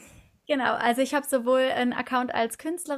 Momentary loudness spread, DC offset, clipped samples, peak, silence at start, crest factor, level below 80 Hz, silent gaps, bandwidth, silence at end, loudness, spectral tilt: 6 LU; under 0.1%; under 0.1%; -8 dBFS; 0 s; 18 dB; -66 dBFS; none; 15 kHz; 0 s; -25 LUFS; -3 dB/octave